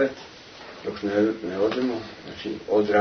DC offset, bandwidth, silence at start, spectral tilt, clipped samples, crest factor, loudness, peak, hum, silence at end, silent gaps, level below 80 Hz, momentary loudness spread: under 0.1%; 6.6 kHz; 0 s; -6 dB/octave; under 0.1%; 18 dB; -26 LUFS; -8 dBFS; none; 0 s; none; -60 dBFS; 18 LU